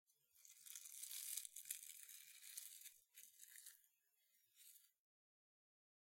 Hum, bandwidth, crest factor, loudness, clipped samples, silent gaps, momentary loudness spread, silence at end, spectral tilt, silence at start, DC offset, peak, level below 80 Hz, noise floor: none; 16.5 kHz; 36 dB; -54 LUFS; under 0.1%; none; 17 LU; 1.15 s; 6 dB/octave; 0.1 s; under 0.1%; -24 dBFS; under -90 dBFS; -83 dBFS